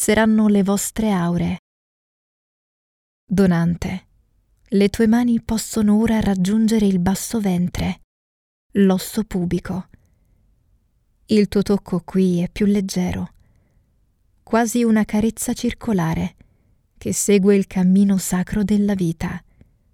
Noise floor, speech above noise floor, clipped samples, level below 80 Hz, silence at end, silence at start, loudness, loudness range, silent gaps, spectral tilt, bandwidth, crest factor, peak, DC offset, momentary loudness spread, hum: -61 dBFS; 43 dB; under 0.1%; -42 dBFS; 0.55 s; 0 s; -19 LUFS; 5 LU; 1.59-3.27 s, 8.04-8.70 s; -6 dB/octave; 16 kHz; 16 dB; -4 dBFS; under 0.1%; 10 LU; none